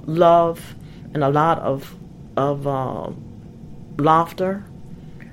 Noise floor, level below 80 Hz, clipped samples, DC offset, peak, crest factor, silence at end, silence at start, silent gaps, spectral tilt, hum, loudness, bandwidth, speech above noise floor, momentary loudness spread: -38 dBFS; -48 dBFS; under 0.1%; under 0.1%; -2 dBFS; 20 dB; 0 s; 0 s; none; -7.5 dB/octave; none; -20 LUFS; 16.5 kHz; 19 dB; 24 LU